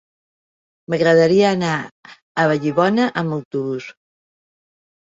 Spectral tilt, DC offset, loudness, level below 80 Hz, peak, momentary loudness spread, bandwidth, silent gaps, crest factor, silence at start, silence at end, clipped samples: -6.5 dB/octave; under 0.1%; -18 LUFS; -62 dBFS; -2 dBFS; 14 LU; 7.8 kHz; 1.91-2.03 s, 2.22-2.35 s, 3.45-3.51 s; 18 dB; 0.9 s; 1.2 s; under 0.1%